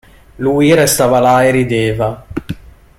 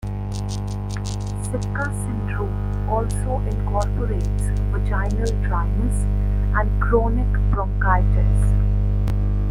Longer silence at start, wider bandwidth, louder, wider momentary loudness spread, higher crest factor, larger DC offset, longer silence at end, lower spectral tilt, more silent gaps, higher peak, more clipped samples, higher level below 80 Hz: first, 0.4 s vs 0 s; first, 16.5 kHz vs 11.5 kHz; first, -12 LUFS vs -22 LUFS; first, 16 LU vs 8 LU; about the same, 14 dB vs 16 dB; neither; first, 0.45 s vs 0 s; second, -5 dB/octave vs -7 dB/octave; neither; first, 0 dBFS vs -4 dBFS; neither; second, -38 dBFS vs -22 dBFS